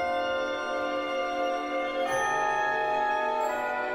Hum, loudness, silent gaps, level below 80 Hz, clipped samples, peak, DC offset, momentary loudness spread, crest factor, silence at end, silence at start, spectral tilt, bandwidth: none; -28 LUFS; none; -60 dBFS; under 0.1%; -16 dBFS; under 0.1%; 4 LU; 12 dB; 0 s; 0 s; -3 dB/octave; 16 kHz